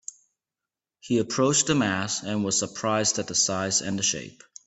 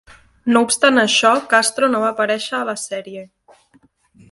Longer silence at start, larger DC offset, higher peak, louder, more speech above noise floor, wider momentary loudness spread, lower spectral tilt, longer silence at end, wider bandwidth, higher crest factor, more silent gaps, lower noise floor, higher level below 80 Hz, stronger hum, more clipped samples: first, 1.05 s vs 0.45 s; neither; second, -8 dBFS vs 0 dBFS; second, -24 LUFS vs -16 LUFS; first, 64 dB vs 39 dB; second, 6 LU vs 14 LU; about the same, -3 dB/octave vs -2 dB/octave; second, 0.35 s vs 1.05 s; second, 8.4 kHz vs 11.5 kHz; about the same, 18 dB vs 18 dB; neither; first, -89 dBFS vs -56 dBFS; about the same, -64 dBFS vs -62 dBFS; neither; neither